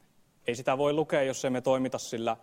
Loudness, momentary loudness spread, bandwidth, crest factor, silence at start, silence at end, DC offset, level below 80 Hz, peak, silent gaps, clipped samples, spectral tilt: -29 LUFS; 6 LU; 16 kHz; 16 dB; 0.45 s; 0.05 s; under 0.1%; -68 dBFS; -12 dBFS; none; under 0.1%; -4.5 dB/octave